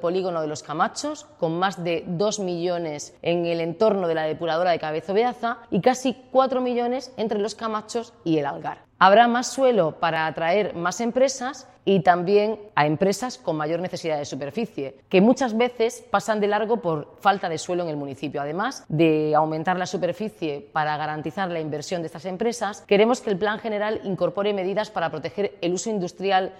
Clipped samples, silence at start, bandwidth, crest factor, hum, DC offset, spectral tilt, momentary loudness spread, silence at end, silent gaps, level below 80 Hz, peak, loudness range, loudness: under 0.1%; 0 s; 14.5 kHz; 22 dB; none; under 0.1%; -5 dB/octave; 10 LU; 0 s; none; -64 dBFS; -2 dBFS; 4 LU; -24 LUFS